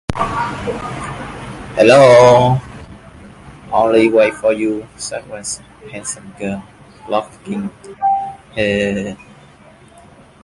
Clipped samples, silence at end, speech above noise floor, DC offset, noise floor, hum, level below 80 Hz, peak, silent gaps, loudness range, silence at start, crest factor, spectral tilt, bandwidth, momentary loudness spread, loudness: under 0.1%; 1.3 s; 30 dB; under 0.1%; -43 dBFS; none; -42 dBFS; 0 dBFS; none; 11 LU; 0.1 s; 16 dB; -5 dB/octave; 11.5 kHz; 20 LU; -15 LUFS